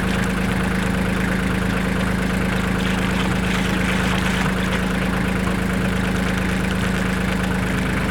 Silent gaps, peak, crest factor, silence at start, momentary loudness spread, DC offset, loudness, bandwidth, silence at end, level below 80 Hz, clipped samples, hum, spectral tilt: none; -6 dBFS; 14 dB; 0 s; 1 LU; under 0.1%; -21 LUFS; 18 kHz; 0 s; -30 dBFS; under 0.1%; none; -5.5 dB/octave